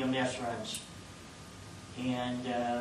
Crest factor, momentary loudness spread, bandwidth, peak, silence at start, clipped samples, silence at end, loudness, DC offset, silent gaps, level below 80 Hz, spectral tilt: 16 dB; 16 LU; 12.5 kHz; -20 dBFS; 0 s; under 0.1%; 0 s; -36 LUFS; under 0.1%; none; -62 dBFS; -4.5 dB/octave